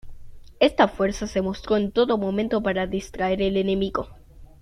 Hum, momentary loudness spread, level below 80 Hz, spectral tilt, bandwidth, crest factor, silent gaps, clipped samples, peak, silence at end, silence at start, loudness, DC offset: none; 7 LU; -44 dBFS; -6 dB/octave; 11 kHz; 22 dB; none; under 0.1%; -2 dBFS; 0.15 s; 0.05 s; -23 LUFS; under 0.1%